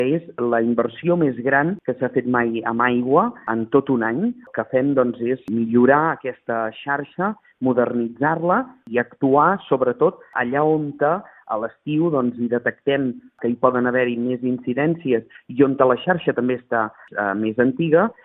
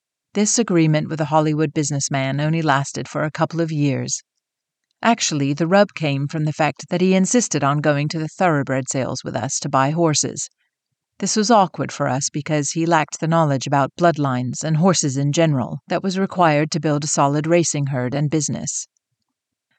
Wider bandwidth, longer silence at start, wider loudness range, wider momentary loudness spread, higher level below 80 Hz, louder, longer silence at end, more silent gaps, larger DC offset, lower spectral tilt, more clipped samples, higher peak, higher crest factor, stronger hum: second, 3.9 kHz vs 9.2 kHz; second, 0 s vs 0.35 s; about the same, 2 LU vs 3 LU; about the same, 8 LU vs 7 LU; about the same, -62 dBFS vs -64 dBFS; about the same, -20 LUFS vs -19 LUFS; second, 0.1 s vs 0.95 s; neither; neither; first, -10.5 dB/octave vs -5 dB/octave; neither; first, 0 dBFS vs -4 dBFS; about the same, 20 dB vs 16 dB; neither